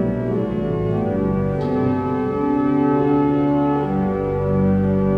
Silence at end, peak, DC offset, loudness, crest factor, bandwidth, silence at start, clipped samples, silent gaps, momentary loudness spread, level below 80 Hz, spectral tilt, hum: 0 s; -6 dBFS; under 0.1%; -19 LUFS; 12 dB; 5.2 kHz; 0 s; under 0.1%; none; 4 LU; -38 dBFS; -10.5 dB/octave; none